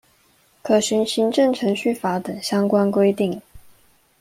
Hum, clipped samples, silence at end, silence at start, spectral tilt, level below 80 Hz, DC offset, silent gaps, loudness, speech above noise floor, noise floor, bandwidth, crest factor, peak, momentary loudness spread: none; under 0.1%; 0.6 s; 0.65 s; -5 dB/octave; -60 dBFS; under 0.1%; none; -20 LUFS; 39 dB; -59 dBFS; 16 kHz; 16 dB; -4 dBFS; 7 LU